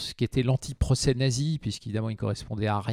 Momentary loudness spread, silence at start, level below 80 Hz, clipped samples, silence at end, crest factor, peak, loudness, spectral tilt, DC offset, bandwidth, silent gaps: 7 LU; 0 s; -42 dBFS; under 0.1%; 0 s; 16 dB; -12 dBFS; -28 LUFS; -5.5 dB/octave; under 0.1%; 13.5 kHz; none